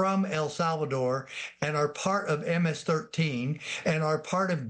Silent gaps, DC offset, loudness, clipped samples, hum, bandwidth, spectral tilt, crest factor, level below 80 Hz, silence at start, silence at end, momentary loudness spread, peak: none; under 0.1%; -29 LUFS; under 0.1%; none; 9.8 kHz; -5.5 dB/octave; 18 dB; -70 dBFS; 0 s; 0 s; 5 LU; -10 dBFS